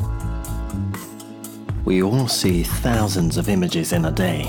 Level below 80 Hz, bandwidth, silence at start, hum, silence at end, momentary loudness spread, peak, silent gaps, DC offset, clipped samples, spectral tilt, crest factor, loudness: -30 dBFS; 19 kHz; 0 s; none; 0 s; 14 LU; -8 dBFS; none; under 0.1%; under 0.1%; -5.5 dB/octave; 12 dB; -21 LUFS